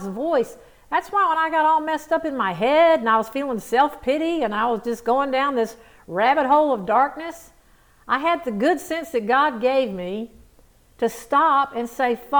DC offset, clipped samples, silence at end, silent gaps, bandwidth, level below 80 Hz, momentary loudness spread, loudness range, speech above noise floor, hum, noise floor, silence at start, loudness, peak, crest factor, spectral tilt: under 0.1%; under 0.1%; 0 s; none; over 20 kHz; -56 dBFS; 9 LU; 3 LU; 34 dB; none; -54 dBFS; 0 s; -21 LUFS; -6 dBFS; 16 dB; -4.5 dB/octave